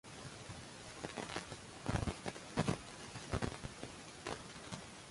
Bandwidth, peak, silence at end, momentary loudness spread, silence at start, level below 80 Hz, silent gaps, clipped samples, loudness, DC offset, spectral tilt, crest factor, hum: 11.5 kHz; -22 dBFS; 0 s; 10 LU; 0.05 s; -56 dBFS; none; under 0.1%; -44 LUFS; under 0.1%; -4.5 dB/octave; 24 dB; none